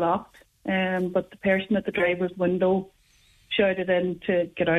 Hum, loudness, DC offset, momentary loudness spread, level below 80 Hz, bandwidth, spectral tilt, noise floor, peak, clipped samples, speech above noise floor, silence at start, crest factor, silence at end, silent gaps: none; -25 LUFS; under 0.1%; 5 LU; -58 dBFS; 6.4 kHz; -7.5 dB/octave; -60 dBFS; -10 dBFS; under 0.1%; 35 dB; 0 s; 16 dB; 0 s; none